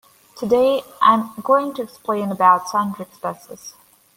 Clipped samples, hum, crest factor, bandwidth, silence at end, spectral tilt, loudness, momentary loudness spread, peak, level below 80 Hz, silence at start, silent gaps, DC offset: under 0.1%; none; 18 dB; 17 kHz; 0.45 s; -5 dB/octave; -19 LUFS; 17 LU; -2 dBFS; -64 dBFS; 0.35 s; none; under 0.1%